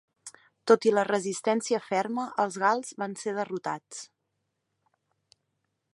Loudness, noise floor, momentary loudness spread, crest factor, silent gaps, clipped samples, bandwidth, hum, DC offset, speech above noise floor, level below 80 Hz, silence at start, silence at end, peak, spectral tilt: -28 LUFS; -80 dBFS; 20 LU; 24 dB; none; under 0.1%; 11.5 kHz; none; under 0.1%; 53 dB; -84 dBFS; 0.25 s; 1.9 s; -6 dBFS; -4 dB/octave